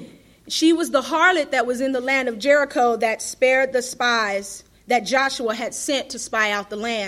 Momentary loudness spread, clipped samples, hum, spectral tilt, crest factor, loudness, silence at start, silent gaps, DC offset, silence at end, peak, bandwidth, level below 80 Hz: 8 LU; under 0.1%; none; -2 dB/octave; 18 dB; -20 LUFS; 0 s; none; under 0.1%; 0 s; -2 dBFS; 15.5 kHz; -60 dBFS